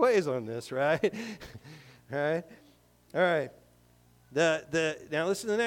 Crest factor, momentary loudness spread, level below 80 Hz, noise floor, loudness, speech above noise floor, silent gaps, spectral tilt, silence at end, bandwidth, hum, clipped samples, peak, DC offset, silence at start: 16 dB; 14 LU; -66 dBFS; -62 dBFS; -30 LUFS; 32 dB; none; -4.5 dB/octave; 0 s; 17 kHz; 60 Hz at -60 dBFS; under 0.1%; -14 dBFS; under 0.1%; 0 s